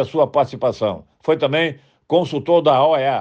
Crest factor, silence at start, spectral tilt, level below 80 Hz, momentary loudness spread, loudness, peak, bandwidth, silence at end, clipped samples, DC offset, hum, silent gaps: 14 dB; 0 s; -6.5 dB/octave; -62 dBFS; 9 LU; -18 LUFS; -4 dBFS; 8.2 kHz; 0 s; under 0.1%; under 0.1%; none; none